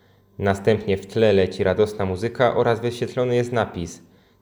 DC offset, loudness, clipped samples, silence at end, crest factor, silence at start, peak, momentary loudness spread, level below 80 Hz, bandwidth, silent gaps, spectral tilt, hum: under 0.1%; -21 LUFS; under 0.1%; 0.45 s; 18 dB; 0.4 s; -4 dBFS; 7 LU; -52 dBFS; over 20 kHz; none; -6.5 dB/octave; none